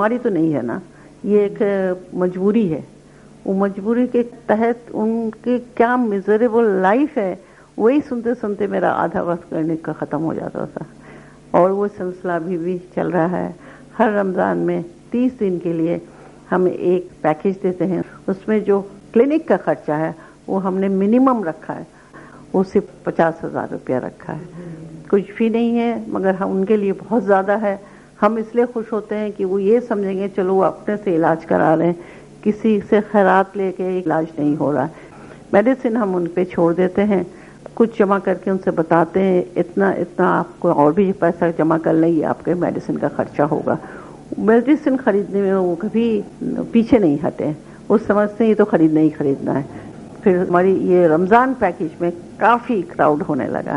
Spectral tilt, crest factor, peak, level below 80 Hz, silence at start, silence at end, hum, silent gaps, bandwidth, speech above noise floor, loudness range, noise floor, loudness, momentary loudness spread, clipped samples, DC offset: -8.5 dB/octave; 18 dB; 0 dBFS; -54 dBFS; 0 s; 0 s; none; none; 11 kHz; 27 dB; 4 LU; -44 dBFS; -18 LUFS; 10 LU; under 0.1%; under 0.1%